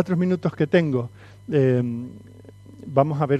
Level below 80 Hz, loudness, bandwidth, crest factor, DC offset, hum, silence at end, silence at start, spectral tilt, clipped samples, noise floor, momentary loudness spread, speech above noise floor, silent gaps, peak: -60 dBFS; -22 LUFS; 8.6 kHz; 20 dB; under 0.1%; 50 Hz at -45 dBFS; 0 s; 0 s; -9 dB/octave; under 0.1%; -44 dBFS; 17 LU; 22 dB; none; -4 dBFS